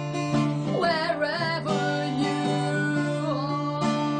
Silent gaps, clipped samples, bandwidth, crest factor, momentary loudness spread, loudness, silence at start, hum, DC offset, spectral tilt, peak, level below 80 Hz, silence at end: none; under 0.1%; 9.8 kHz; 14 dB; 3 LU; -26 LUFS; 0 s; none; under 0.1%; -6 dB/octave; -12 dBFS; -62 dBFS; 0 s